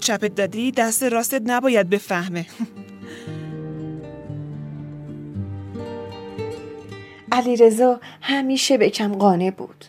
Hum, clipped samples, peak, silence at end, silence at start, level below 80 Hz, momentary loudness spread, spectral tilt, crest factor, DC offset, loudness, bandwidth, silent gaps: none; under 0.1%; -2 dBFS; 0 s; 0 s; -60 dBFS; 18 LU; -4 dB/octave; 20 dB; under 0.1%; -20 LUFS; 16.5 kHz; none